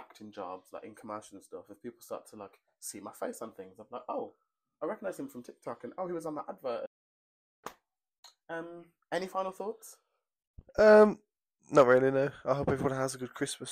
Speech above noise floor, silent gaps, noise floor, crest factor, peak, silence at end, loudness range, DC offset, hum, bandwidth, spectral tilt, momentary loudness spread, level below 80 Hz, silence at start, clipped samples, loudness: 33 dB; 6.87-7.63 s, 8.18-8.23 s, 10.47-10.54 s; -64 dBFS; 22 dB; -10 dBFS; 0 s; 18 LU; under 0.1%; none; 15.5 kHz; -5.5 dB/octave; 25 LU; -64 dBFS; 0 s; under 0.1%; -30 LUFS